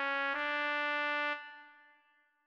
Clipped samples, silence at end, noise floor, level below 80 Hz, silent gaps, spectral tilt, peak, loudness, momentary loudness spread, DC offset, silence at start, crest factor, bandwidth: under 0.1%; 0.75 s; -71 dBFS; -84 dBFS; none; -1.5 dB/octave; -22 dBFS; -34 LUFS; 14 LU; under 0.1%; 0 s; 16 dB; 8.4 kHz